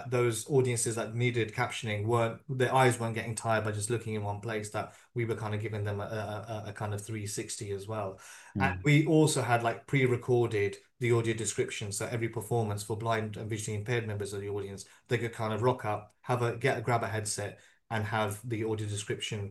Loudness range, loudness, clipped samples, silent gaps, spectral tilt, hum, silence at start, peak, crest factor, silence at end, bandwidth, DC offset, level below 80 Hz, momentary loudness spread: 7 LU; -32 LUFS; under 0.1%; none; -5 dB/octave; none; 0 s; -10 dBFS; 20 dB; 0 s; 12.5 kHz; under 0.1%; -66 dBFS; 10 LU